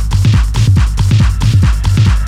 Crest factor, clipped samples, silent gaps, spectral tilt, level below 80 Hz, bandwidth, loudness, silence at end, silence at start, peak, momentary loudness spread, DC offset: 10 dB; under 0.1%; none; -6 dB/octave; -14 dBFS; 13 kHz; -11 LUFS; 0 s; 0 s; 0 dBFS; 1 LU; under 0.1%